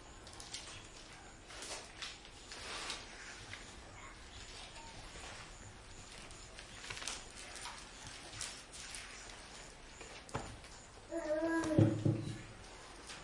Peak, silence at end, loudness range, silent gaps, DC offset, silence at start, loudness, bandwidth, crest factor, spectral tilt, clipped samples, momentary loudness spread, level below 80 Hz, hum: -16 dBFS; 0 s; 12 LU; none; under 0.1%; 0 s; -43 LUFS; 11.5 kHz; 28 dB; -4.5 dB/octave; under 0.1%; 16 LU; -60 dBFS; none